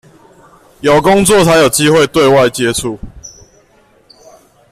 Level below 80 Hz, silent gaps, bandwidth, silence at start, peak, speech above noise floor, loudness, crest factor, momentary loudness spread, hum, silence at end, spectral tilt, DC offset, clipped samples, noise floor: -38 dBFS; none; 15.5 kHz; 0.85 s; 0 dBFS; 40 dB; -9 LUFS; 12 dB; 13 LU; none; 1.4 s; -4 dB/octave; under 0.1%; under 0.1%; -49 dBFS